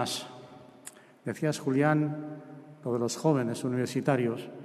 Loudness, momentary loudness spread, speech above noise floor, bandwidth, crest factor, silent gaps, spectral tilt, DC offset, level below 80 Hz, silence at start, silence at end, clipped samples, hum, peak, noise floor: -30 LUFS; 21 LU; 22 dB; 13.5 kHz; 18 dB; none; -6 dB/octave; under 0.1%; -74 dBFS; 0 s; 0 s; under 0.1%; none; -12 dBFS; -51 dBFS